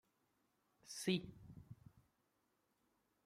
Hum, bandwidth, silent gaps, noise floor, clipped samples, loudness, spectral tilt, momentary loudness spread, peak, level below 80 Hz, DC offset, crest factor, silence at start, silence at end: none; 15.5 kHz; none; -83 dBFS; under 0.1%; -43 LUFS; -4.5 dB/octave; 21 LU; -26 dBFS; -76 dBFS; under 0.1%; 24 dB; 0.85 s; 1.25 s